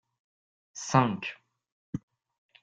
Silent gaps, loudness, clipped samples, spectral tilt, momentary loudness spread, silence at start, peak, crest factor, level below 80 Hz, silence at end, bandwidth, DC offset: 1.72-1.93 s; -28 LUFS; under 0.1%; -5.5 dB/octave; 16 LU; 0.75 s; -8 dBFS; 26 dB; -68 dBFS; 0.65 s; 9 kHz; under 0.1%